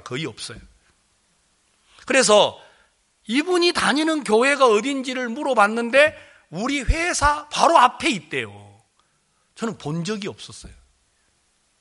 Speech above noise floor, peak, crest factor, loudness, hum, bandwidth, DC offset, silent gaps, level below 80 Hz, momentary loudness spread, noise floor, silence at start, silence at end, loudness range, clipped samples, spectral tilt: 46 dB; 0 dBFS; 22 dB; -19 LUFS; none; 11.5 kHz; under 0.1%; none; -40 dBFS; 16 LU; -66 dBFS; 0.05 s; 1.1 s; 10 LU; under 0.1%; -3.5 dB/octave